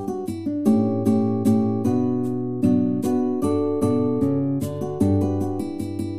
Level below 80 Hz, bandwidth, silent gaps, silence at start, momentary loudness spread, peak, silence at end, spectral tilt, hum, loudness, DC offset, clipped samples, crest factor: -54 dBFS; 15 kHz; none; 0 s; 7 LU; -8 dBFS; 0 s; -9 dB/octave; none; -22 LUFS; 0.9%; under 0.1%; 14 dB